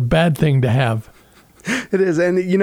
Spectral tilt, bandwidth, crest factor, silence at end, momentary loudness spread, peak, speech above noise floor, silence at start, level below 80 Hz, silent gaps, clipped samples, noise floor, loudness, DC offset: -7 dB/octave; 16 kHz; 14 dB; 0 s; 8 LU; -4 dBFS; 33 dB; 0 s; -40 dBFS; none; under 0.1%; -49 dBFS; -17 LUFS; under 0.1%